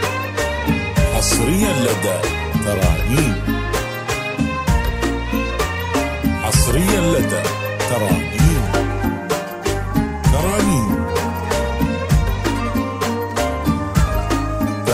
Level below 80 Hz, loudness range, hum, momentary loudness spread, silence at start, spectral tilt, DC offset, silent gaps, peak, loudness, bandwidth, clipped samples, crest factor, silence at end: -24 dBFS; 2 LU; none; 6 LU; 0 s; -5 dB/octave; under 0.1%; none; -2 dBFS; -19 LUFS; 16 kHz; under 0.1%; 16 dB; 0 s